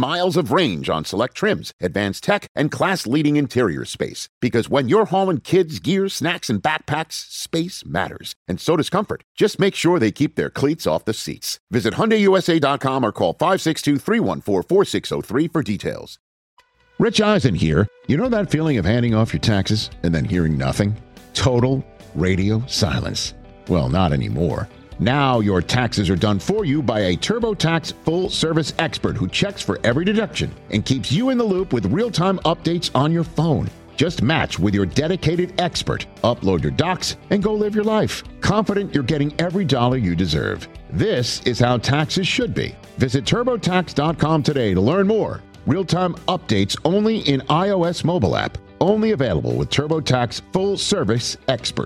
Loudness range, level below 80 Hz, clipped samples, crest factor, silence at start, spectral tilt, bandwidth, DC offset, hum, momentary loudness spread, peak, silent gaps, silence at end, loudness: 2 LU; -42 dBFS; under 0.1%; 18 dB; 0 s; -5.5 dB/octave; 16.5 kHz; under 0.1%; none; 7 LU; -2 dBFS; 1.73-1.79 s, 2.49-2.55 s, 4.29-4.41 s, 8.36-8.46 s, 9.24-9.35 s, 11.60-11.67 s, 16.20-16.57 s; 0 s; -20 LUFS